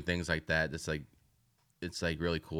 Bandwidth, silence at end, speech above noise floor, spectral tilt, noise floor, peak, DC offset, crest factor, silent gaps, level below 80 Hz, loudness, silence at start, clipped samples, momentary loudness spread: 15.5 kHz; 0 s; 38 dB; -5 dB/octave; -73 dBFS; -16 dBFS; under 0.1%; 20 dB; none; -52 dBFS; -35 LUFS; 0 s; under 0.1%; 9 LU